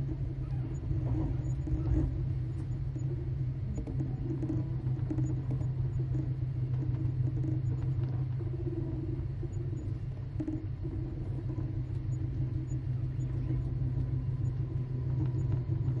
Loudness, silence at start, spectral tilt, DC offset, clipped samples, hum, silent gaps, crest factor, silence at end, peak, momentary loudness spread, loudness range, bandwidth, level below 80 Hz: -34 LUFS; 0 s; -10 dB/octave; under 0.1%; under 0.1%; none; none; 14 dB; 0 s; -18 dBFS; 4 LU; 3 LU; 7.4 kHz; -42 dBFS